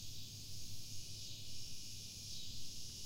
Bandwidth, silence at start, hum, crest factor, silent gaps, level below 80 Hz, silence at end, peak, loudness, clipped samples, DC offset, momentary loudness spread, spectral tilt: 16 kHz; 0 s; none; 10 dB; none; -62 dBFS; 0 s; -34 dBFS; -49 LUFS; under 0.1%; under 0.1%; 2 LU; -2 dB/octave